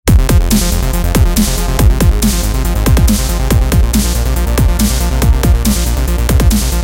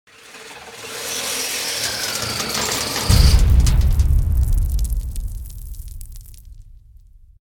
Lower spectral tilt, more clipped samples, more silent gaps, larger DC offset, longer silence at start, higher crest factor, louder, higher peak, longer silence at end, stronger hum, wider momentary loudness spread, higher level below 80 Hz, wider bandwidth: first, -5 dB/octave vs -3.5 dB/octave; neither; neither; neither; second, 0.05 s vs 0.3 s; second, 10 dB vs 18 dB; first, -12 LUFS vs -19 LUFS; about the same, 0 dBFS vs 0 dBFS; second, 0 s vs 0.75 s; neither; second, 4 LU vs 22 LU; first, -12 dBFS vs -20 dBFS; second, 17.5 kHz vs 19.5 kHz